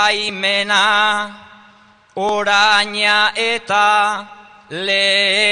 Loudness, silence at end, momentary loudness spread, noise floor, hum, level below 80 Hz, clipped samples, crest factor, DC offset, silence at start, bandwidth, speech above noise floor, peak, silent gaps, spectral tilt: -14 LUFS; 0 s; 11 LU; -49 dBFS; none; -64 dBFS; under 0.1%; 16 dB; 0.3%; 0 s; 10 kHz; 33 dB; -2 dBFS; none; -1 dB/octave